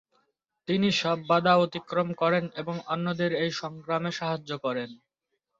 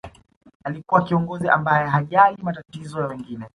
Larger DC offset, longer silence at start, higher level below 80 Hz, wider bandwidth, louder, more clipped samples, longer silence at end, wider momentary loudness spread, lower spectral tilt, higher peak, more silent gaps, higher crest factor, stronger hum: neither; first, 0.7 s vs 0.05 s; second, -70 dBFS vs -56 dBFS; second, 7.8 kHz vs 11 kHz; second, -27 LUFS vs -20 LUFS; neither; first, 0.65 s vs 0.1 s; second, 11 LU vs 16 LU; second, -5.5 dB/octave vs -8 dB/octave; second, -8 dBFS vs -2 dBFS; second, none vs 0.36-0.41 s, 0.55-0.60 s; about the same, 20 dB vs 20 dB; neither